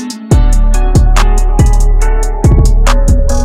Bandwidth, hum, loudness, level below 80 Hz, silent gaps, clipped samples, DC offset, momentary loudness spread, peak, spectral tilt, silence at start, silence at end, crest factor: 12.5 kHz; none; -11 LUFS; -8 dBFS; none; under 0.1%; under 0.1%; 3 LU; 0 dBFS; -6 dB/octave; 0 s; 0 s; 6 dB